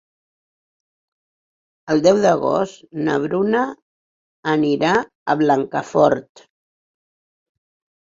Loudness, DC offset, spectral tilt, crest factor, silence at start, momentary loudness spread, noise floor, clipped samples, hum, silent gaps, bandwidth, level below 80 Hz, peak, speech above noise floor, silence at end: -19 LUFS; under 0.1%; -6 dB/octave; 18 dB; 1.85 s; 9 LU; under -90 dBFS; under 0.1%; none; 3.82-4.43 s, 5.15-5.26 s; 7.8 kHz; -60 dBFS; -2 dBFS; over 72 dB; 1.8 s